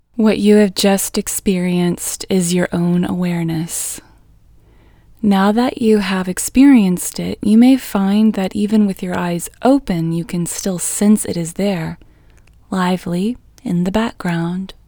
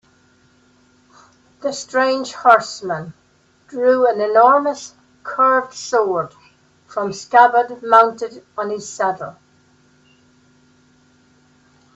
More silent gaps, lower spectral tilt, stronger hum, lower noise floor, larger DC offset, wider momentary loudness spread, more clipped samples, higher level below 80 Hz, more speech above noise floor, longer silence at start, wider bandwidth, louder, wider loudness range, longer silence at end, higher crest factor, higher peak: neither; first, -5.5 dB/octave vs -3.5 dB/octave; neither; second, -47 dBFS vs -55 dBFS; neither; second, 10 LU vs 17 LU; neither; first, -44 dBFS vs -68 dBFS; second, 32 dB vs 39 dB; second, 0.15 s vs 1.65 s; first, over 20 kHz vs 8.2 kHz; about the same, -16 LUFS vs -17 LUFS; second, 6 LU vs 9 LU; second, 0.15 s vs 2.65 s; about the same, 16 dB vs 20 dB; about the same, 0 dBFS vs 0 dBFS